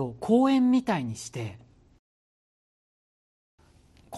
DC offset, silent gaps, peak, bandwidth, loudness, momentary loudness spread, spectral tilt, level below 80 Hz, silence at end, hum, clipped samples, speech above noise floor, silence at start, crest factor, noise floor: under 0.1%; 1.99-3.58 s; -10 dBFS; 12 kHz; -25 LUFS; 16 LU; -6 dB/octave; -64 dBFS; 0 s; none; under 0.1%; 33 dB; 0 s; 18 dB; -58 dBFS